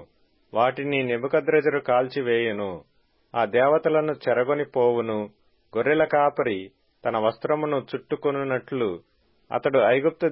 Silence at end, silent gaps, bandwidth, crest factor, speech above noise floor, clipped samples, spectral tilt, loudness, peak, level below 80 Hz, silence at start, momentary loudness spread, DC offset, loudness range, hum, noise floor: 0 s; none; 5.6 kHz; 16 dB; 36 dB; under 0.1%; -10.5 dB/octave; -24 LUFS; -8 dBFS; -66 dBFS; 0 s; 11 LU; under 0.1%; 3 LU; none; -59 dBFS